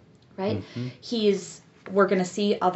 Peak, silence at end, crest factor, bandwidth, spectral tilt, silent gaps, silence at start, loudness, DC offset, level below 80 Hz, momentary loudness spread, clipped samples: -8 dBFS; 0 s; 18 dB; 8 kHz; -5 dB/octave; none; 0.4 s; -26 LUFS; under 0.1%; -70 dBFS; 17 LU; under 0.1%